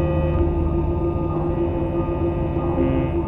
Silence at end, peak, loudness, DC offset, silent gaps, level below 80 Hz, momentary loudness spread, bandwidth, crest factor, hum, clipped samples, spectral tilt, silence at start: 0 s; -8 dBFS; -22 LUFS; under 0.1%; none; -28 dBFS; 2 LU; 3.9 kHz; 12 dB; none; under 0.1%; -11.5 dB/octave; 0 s